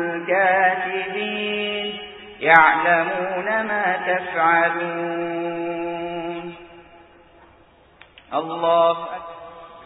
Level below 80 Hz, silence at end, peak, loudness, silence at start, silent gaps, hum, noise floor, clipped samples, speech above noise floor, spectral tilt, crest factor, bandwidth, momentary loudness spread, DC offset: -62 dBFS; 0 s; 0 dBFS; -20 LUFS; 0 s; none; none; -52 dBFS; under 0.1%; 33 dB; -7 dB/octave; 22 dB; 4 kHz; 17 LU; under 0.1%